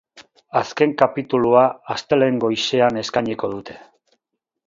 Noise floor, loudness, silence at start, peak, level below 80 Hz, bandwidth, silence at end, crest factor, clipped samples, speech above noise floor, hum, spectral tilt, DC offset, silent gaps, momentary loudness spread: -80 dBFS; -19 LUFS; 0.15 s; 0 dBFS; -58 dBFS; 7.8 kHz; 0.9 s; 20 dB; under 0.1%; 61 dB; none; -5 dB/octave; under 0.1%; none; 11 LU